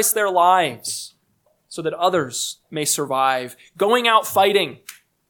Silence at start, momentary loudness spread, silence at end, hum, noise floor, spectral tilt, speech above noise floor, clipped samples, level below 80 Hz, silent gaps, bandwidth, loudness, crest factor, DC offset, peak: 0 s; 14 LU; 0.35 s; none; -65 dBFS; -2 dB/octave; 45 dB; under 0.1%; -72 dBFS; none; 19 kHz; -19 LUFS; 18 dB; under 0.1%; -2 dBFS